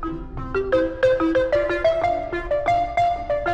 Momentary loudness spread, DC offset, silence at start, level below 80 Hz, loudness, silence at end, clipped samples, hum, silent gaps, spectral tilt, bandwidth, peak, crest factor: 7 LU; under 0.1%; 0 s; -38 dBFS; -21 LUFS; 0 s; under 0.1%; none; none; -6.5 dB/octave; 8.8 kHz; -8 dBFS; 14 dB